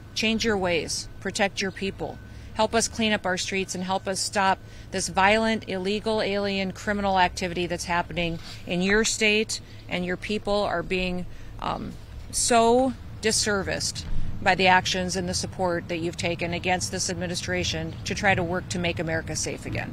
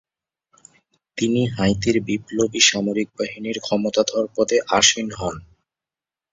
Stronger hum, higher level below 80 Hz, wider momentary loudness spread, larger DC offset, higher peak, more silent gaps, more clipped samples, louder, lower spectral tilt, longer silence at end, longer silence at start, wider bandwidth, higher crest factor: neither; first, -40 dBFS vs -50 dBFS; about the same, 11 LU vs 12 LU; neither; second, -4 dBFS vs 0 dBFS; neither; neither; second, -25 LUFS vs -20 LUFS; about the same, -3.5 dB/octave vs -3 dB/octave; second, 0 s vs 0.9 s; second, 0 s vs 1.15 s; first, 16 kHz vs 7.8 kHz; about the same, 22 dB vs 22 dB